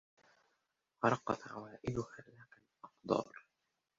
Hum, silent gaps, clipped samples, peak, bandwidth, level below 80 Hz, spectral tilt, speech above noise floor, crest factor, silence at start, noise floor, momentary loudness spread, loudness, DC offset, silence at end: none; none; under 0.1%; -16 dBFS; 7.6 kHz; -70 dBFS; -5.5 dB/octave; 47 dB; 26 dB; 1 s; -86 dBFS; 23 LU; -39 LUFS; under 0.1%; 0.6 s